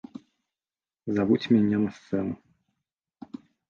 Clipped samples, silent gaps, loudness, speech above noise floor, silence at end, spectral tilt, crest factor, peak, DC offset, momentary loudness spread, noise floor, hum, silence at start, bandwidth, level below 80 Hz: under 0.1%; none; -26 LUFS; over 66 dB; 1.35 s; -8 dB/octave; 20 dB; -10 dBFS; under 0.1%; 22 LU; under -90 dBFS; none; 1.05 s; 6.8 kHz; -62 dBFS